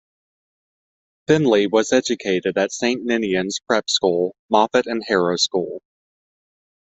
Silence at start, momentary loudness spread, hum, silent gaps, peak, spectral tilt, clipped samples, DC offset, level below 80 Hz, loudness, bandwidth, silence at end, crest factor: 1.3 s; 6 LU; none; 4.39-4.49 s; -2 dBFS; -4 dB/octave; under 0.1%; under 0.1%; -62 dBFS; -19 LUFS; 8.2 kHz; 1.05 s; 18 dB